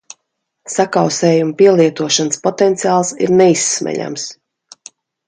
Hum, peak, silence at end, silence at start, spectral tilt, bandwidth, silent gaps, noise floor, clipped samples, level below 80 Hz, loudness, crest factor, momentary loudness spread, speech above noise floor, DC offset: none; 0 dBFS; 0.95 s; 0.65 s; -4 dB/octave; 9.6 kHz; none; -72 dBFS; under 0.1%; -62 dBFS; -14 LUFS; 14 dB; 11 LU; 59 dB; under 0.1%